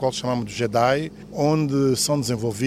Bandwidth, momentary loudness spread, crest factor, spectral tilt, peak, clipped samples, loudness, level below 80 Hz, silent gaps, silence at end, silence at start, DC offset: 16 kHz; 6 LU; 18 dB; -5 dB/octave; -4 dBFS; under 0.1%; -22 LUFS; -52 dBFS; none; 0 s; 0 s; under 0.1%